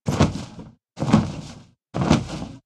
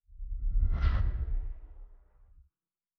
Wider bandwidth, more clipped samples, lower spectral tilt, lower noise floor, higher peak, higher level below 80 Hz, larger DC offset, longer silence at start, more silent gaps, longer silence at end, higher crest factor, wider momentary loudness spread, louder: first, 12 kHz vs 5 kHz; neither; about the same, -6.5 dB/octave vs -7 dB/octave; second, -43 dBFS vs under -90 dBFS; first, -2 dBFS vs -14 dBFS; second, -40 dBFS vs -32 dBFS; neither; about the same, 0.05 s vs 0.1 s; neither; second, 0.05 s vs 1.05 s; about the same, 20 dB vs 16 dB; first, 21 LU vs 17 LU; first, -23 LUFS vs -34 LUFS